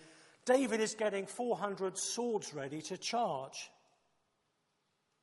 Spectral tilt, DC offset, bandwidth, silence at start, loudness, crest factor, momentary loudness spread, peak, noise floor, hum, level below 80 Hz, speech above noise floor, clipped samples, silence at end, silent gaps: -3 dB/octave; under 0.1%; 11.5 kHz; 0 s; -36 LUFS; 20 dB; 12 LU; -18 dBFS; -81 dBFS; none; -88 dBFS; 45 dB; under 0.1%; 1.55 s; none